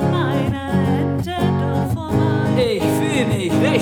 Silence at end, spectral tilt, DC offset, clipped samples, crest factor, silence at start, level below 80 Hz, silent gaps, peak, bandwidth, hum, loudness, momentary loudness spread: 0 s; -6.5 dB/octave; under 0.1%; under 0.1%; 14 dB; 0 s; -44 dBFS; none; -4 dBFS; 19.5 kHz; none; -19 LUFS; 3 LU